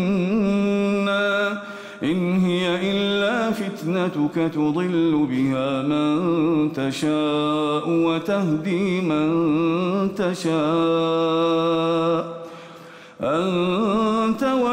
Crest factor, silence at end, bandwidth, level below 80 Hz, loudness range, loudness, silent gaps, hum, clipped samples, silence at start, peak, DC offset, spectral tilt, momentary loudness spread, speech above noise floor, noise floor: 8 dB; 0 s; 15.5 kHz; -58 dBFS; 1 LU; -21 LUFS; none; none; under 0.1%; 0 s; -12 dBFS; under 0.1%; -6.5 dB/octave; 5 LU; 22 dB; -42 dBFS